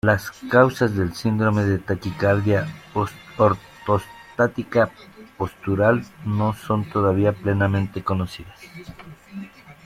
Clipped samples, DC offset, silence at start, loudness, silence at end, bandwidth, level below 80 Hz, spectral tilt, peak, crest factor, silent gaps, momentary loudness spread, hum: under 0.1%; under 0.1%; 0.05 s; -22 LUFS; 0.15 s; 15 kHz; -52 dBFS; -7.5 dB/octave; -2 dBFS; 20 dB; none; 19 LU; none